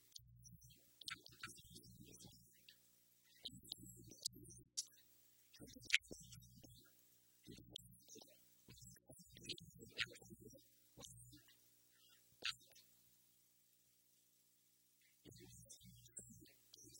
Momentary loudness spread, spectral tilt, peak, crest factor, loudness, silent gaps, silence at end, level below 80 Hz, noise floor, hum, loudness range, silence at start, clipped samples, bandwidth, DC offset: 20 LU; -1 dB/octave; -14 dBFS; 42 dB; -51 LUFS; none; 0 s; -78 dBFS; -77 dBFS; 60 Hz at -75 dBFS; 15 LU; 0 s; under 0.1%; 16.5 kHz; under 0.1%